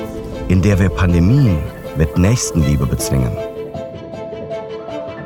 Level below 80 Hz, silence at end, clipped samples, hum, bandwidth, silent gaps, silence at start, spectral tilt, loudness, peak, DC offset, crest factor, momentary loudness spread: -28 dBFS; 0 s; under 0.1%; none; 17.5 kHz; none; 0 s; -6.5 dB/octave; -17 LUFS; -4 dBFS; under 0.1%; 12 dB; 15 LU